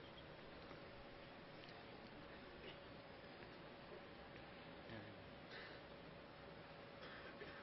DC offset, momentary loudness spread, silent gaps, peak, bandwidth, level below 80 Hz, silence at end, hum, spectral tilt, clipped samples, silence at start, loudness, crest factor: under 0.1%; 3 LU; none; -40 dBFS; 5.8 kHz; -72 dBFS; 0 s; none; -3 dB/octave; under 0.1%; 0 s; -58 LUFS; 18 dB